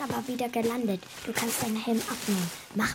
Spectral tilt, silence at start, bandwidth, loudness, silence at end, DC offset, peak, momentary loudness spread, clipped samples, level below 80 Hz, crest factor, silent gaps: -4 dB/octave; 0 s; 17 kHz; -30 LUFS; 0 s; under 0.1%; -14 dBFS; 4 LU; under 0.1%; -60 dBFS; 18 dB; none